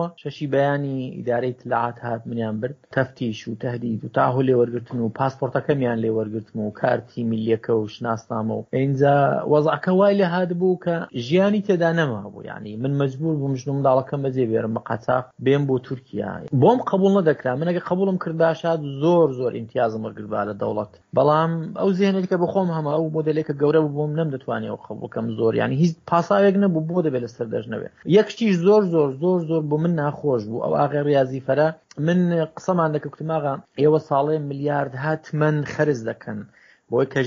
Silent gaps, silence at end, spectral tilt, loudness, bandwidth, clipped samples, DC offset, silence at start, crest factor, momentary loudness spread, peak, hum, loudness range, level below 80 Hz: none; 0 s; -6.5 dB/octave; -22 LUFS; 7.4 kHz; under 0.1%; under 0.1%; 0 s; 18 dB; 10 LU; -4 dBFS; none; 4 LU; -64 dBFS